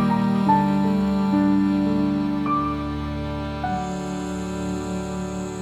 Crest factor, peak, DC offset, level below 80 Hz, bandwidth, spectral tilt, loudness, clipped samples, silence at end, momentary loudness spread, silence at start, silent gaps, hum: 16 dB; -6 dBFS; under 0.1%; -40 dBFS; 12 kHz; -7 dB/octave; -23 LUFS; under 0.1%; 0 s; 9 LU; 0 s; none; none